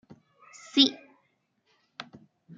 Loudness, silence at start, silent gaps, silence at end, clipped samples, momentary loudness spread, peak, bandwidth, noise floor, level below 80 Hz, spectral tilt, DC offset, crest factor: -24 LUFS; 0.75 s; none; 0.55 s; under 0.1%; 25 LU; -6 dBFS; 7.6 kHz; -73 dBFS; -80 dBFS; -2.5 dB/octave; under 0.1%; 26 dB